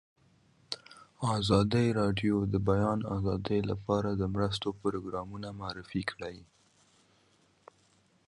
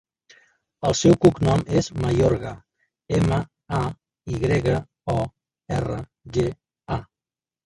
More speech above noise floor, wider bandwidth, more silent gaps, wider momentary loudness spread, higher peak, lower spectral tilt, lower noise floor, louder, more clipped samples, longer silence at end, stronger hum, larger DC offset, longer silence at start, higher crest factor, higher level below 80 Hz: second, 37 dB vs over 69 dB; about the same, 11.5 kHz vs 11.5 kHz; neither; about the same, 14 LU vs 14 LU; second, -12 dBFS vs -2 dBFS; about the same, -6.5 dB/octave vs -6.5 dB/octave; second, -68 dBFS vs under -90 dBFS; second, -32 LUFS vs -23 LUFS; neither; first, 1.85 s vs 0.6 s; neither; neither; about the same, 0.7 s vs 0.8 s; about the same, 22 dB vs 22 dB; second, -52 dBFS vs -42 dBFS